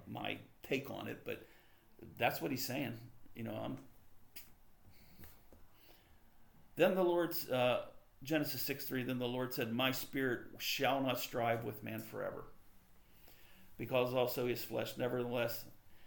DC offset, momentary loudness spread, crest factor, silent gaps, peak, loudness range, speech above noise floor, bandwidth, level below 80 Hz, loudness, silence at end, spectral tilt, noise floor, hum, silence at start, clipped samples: under 0.1%; 19 LU; 22 dB; none; -18 dBFS; 9 LU; 24 dB; 19 kHz; -68 dBFS; -38 LUFS; 0 s; -5 dB/octave; -62 dBFS; none; 0 s; under 0.1%